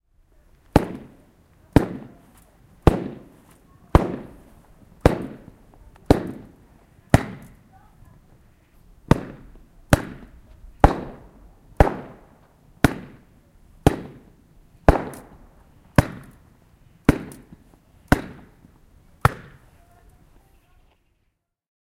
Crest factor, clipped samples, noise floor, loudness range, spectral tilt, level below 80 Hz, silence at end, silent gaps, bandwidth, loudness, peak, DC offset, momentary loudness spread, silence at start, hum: 26 dB; under 0.1%; -72 dBFS; 4 LU; -7 dB/octave; -32 dBFS; 2.45 s; none; 16.5 kHz; -22 LUFS; 0 dBFS; under 0.1%; 23 LU; 0.75 s; none